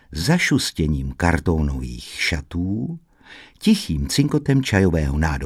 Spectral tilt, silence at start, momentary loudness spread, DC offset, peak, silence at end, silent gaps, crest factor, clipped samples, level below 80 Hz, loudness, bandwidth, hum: -5.5 dB/octave; 0.1 s; 8 LU; under 0.1%; -2 dBFS; 0 s; none; 18 dB; under 0.1%; -30 dBFS; -21 LUFS; 15.5 kHz; none